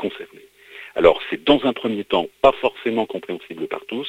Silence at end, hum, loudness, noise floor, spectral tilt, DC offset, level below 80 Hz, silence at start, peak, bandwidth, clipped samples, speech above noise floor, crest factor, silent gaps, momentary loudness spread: 0 s; none; -20 LUFS; -47 dBFS; -6 dB/octave; under 0.1%; -50 dBFS; 0 s; 0 dBFS; 15 kHz; under 0.1%; 27 dB; 20 dB; none; 14 LU